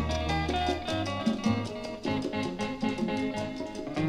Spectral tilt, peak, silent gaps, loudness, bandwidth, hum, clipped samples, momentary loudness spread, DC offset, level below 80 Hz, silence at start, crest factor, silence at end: -5.5 dB/octave; -14 dBFS; none; -31 LUFS; 12.5 kHz; none; under 0.1%; 6 LU; under 0.1%; -44 dBFS; 0 s; 16 dB; 0 s